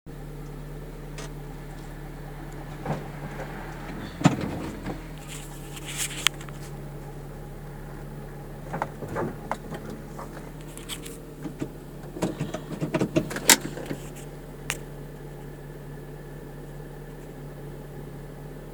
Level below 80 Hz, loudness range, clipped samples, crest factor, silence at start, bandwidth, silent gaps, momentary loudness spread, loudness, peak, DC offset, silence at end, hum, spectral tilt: -44 dBFS; 13 LU; under 0.1%; 32 dB; 0.05 s; over 20 kHz; none; 16 LU; -32 LUFS; 0 dBFS; under 0.1%; 0 s; none; -3.5 dB/octave